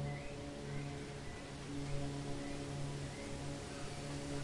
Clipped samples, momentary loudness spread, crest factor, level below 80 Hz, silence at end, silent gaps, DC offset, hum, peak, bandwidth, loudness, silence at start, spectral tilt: under 0.1%; 4 LU; 16 dB; -54 dBFS; 0 s; none; under 0.1%; none; -28 dBFS; 11.5 kHz; -45 LUFS; 0 s; -5.5 dB/octave